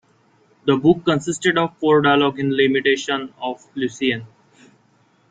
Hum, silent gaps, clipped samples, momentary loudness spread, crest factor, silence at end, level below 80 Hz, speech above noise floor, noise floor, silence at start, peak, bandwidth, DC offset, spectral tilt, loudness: none; none; under 0.1%; 11 LU; 18 dB; 1.05 s; -60 dBFS; 40 dB; -58 dBFS; 0.65 s; -2 dBFS; 9.4 kHz; under 0.1%; -5 dB/octave; -19 LUFS